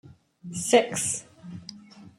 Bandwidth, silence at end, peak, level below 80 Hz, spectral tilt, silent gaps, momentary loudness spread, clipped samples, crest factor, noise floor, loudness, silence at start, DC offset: 16 kHz; 0.1 s; -6 dBFS; -66 dBFS; -3 dB/octave; none; 22 LU; under 0.1%; 22 dB; -46 dBFS; -25 LUFS; 0.05 s; under 0.1%